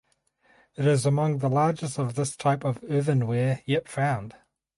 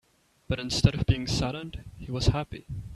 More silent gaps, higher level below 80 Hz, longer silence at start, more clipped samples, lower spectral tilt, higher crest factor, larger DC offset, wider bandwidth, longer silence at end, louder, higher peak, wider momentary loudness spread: neither; second, -64 dBFS vs -38 dBFS; first, 0.8 s vs 0.5 s; neither; about the same, -6.5 dB/octave vs -5.5 dB/octave; second, 16 dB vs 24 dB; neither; about the same, 11.5 kHz vs 12.5 kHz; first, 0.45 s vs 0 s; about the same, -26 LUFS vs -28 LUFS; second, -10 dBFS vs -4 dBFS; second, 6 LU vs 15 LU